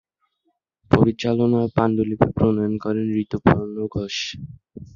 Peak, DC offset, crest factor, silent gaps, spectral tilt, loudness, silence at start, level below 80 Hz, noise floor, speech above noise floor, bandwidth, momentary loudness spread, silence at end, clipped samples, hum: 0 dBFS; under 0.1%; 20 dB; none; -7 dB/octave; -21 LUFS; 0.9 s; -44 dBFS; -72 dBFS; 51 dB; 7.4 kHz; 9 LU; 0.1 s; under 0.1%; none